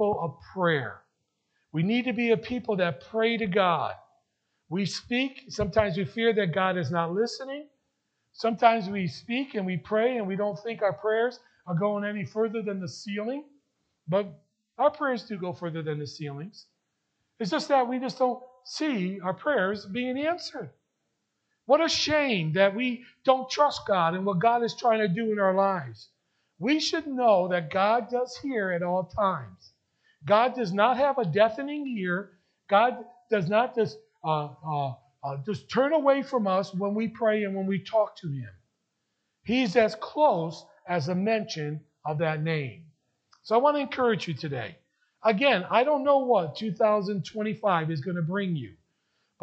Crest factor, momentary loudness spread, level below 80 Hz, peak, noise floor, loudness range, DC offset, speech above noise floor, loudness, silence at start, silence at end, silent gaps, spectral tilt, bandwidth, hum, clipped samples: 22 dB; 12 LU; -64 dBFS; -6 dBFS; -79 dBFS; 6 LU; under 0.1%; 53 dB; -27 LUFS; 0 s; 0.7 s; none; -6 dB/octave; 8.4 kHz; none; under 0.1%